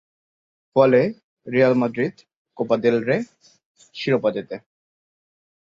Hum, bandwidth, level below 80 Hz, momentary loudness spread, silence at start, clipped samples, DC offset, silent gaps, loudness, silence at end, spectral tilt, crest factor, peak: none; 7.6 kHz; -66 dBFS; 20 LU; 0.75 s; under 0.1%; under 0.1%; 1.23-1.37 s, 2.36-2.45 s, 3.65-3.75 s; -21 LUFS; 1.15 s; -7.5 dB/octave; 20 dB; -2 dBFS